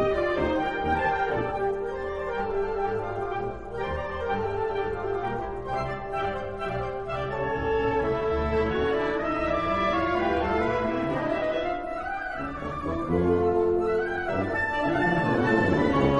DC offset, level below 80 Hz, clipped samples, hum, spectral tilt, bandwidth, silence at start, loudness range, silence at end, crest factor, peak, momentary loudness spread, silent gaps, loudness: 0.3%; -42 dBFS; under 0.1%; none; -7.5 dB/octave; 11 kHz; 0 s; 5 LU; 0 s; 18 dB; -10 dBFS; 8 LU; none; -27 LUFS